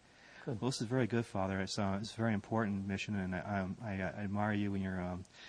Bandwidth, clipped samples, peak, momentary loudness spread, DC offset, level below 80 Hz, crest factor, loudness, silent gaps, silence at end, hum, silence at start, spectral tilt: 10.5 kHz; under 0.1%; -18 dBFS; 5 LU; under 0.1%; -68 dBFS; 18 dB; -37 LUFS; none; 0 s; none; 0.2 s; -6 dB/octave